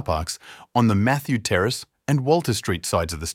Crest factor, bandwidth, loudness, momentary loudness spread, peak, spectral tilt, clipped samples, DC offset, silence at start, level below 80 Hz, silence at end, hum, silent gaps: 18 dB; 17 kHz; -22 LUFS; 7 LU; -4 dBFS; -5 dB/octave; under 0.1%; under 0.1%; 0 s; -42 dBFS; 0 s; none; none